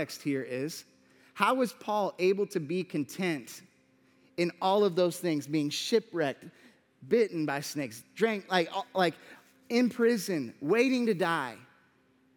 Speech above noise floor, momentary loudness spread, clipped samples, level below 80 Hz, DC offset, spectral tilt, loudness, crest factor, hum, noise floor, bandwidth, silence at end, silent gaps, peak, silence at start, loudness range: 37 dB; 11 LU; under 0.1%; -84 dBFS; under 0.1%; -5 dB/octave; -30 LUFS; 22 dB; none; -67 dBFS; 19.5 kHz; 0.75 s; none; -10 dBFS; 0 s; 2 LU